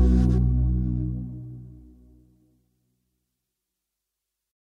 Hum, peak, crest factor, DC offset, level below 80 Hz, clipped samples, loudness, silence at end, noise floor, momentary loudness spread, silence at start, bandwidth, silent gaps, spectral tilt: 50 Hz at -85 dBFS; -8 dBFS; 18 dB; under 0.1%; -30 dBFS; under 0.1%; -25 LUFS; 2.9 s; -84 dBFS; 21 LU; 0 s; 5 kHz; none; -10.5 dB/octave